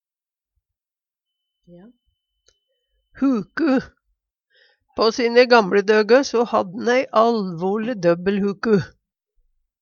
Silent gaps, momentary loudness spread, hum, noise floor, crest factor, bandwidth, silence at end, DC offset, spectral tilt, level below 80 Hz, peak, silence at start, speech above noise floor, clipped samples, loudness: none; 8 LU; none; under -90 dBFS; 20 dB; 7 kHz; 0.95 s; under 0.1%; -5.5 dB/octave; -60 dBFS; -2 dBFS; 3.15 s; over 72 dB; under 0.1%; -19 LUFS